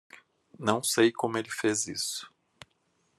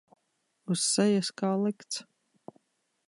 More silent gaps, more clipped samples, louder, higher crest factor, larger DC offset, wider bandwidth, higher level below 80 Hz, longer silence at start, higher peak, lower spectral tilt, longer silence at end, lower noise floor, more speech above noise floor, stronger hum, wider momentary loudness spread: neither; neither; about the same, -28 LUFS vs -29 LUFS; first, 24 dB vs 18 dB; neither; first, 13 kHz vs 11.5 kHz; about the same, -76 dBFS vs -80 dBFS; about the same, 0.6 s vs 0.7 s; first, -8 dBFS vs -14 dBFS; about the same, -3 dB/octave vs -4 dB/octave; second, 0.9 s vs 1.05 s; second, -72 dBFS vs -77 dBFS; second, 44 dB vs 49 dB; neither; second, 9 LU vs 13 LU